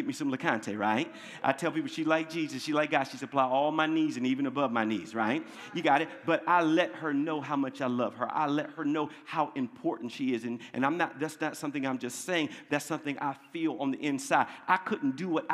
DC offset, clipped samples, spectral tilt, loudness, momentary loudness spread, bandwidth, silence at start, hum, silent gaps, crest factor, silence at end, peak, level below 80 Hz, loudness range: under 0.1%; under 0.1%; -5 dB/octave; -31 LUFS; 7 LU; 14.5 kHz; 0 s; none; none; 22 dB; 0 s; -8 dBFS; -86 dBFS; 4 LU